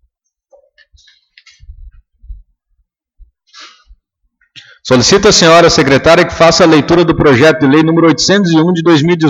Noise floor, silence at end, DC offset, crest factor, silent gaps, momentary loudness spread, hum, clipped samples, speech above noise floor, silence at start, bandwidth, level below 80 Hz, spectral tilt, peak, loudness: -61 dBFS; 0 s; under 0.1%; 10 dB; none; 5 LU; none; under 0.1%; 54 dB; 1.8 s; 11 kHz; -36 dBFS; -4.5 dB/octave; 0 dBFS; -7 LUFS